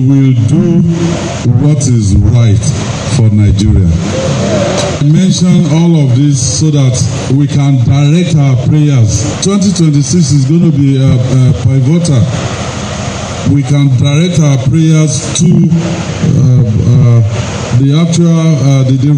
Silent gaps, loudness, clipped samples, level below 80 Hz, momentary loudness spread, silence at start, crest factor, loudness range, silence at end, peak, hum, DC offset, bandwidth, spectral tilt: none; -9 LUFS; 2%; -26 dBFS; 5 LU; 0 s; 8 dB; 2 LU; 0 s; 0 dBFS; none; under 0.1%; 10 kHz; -6.5 dB/octave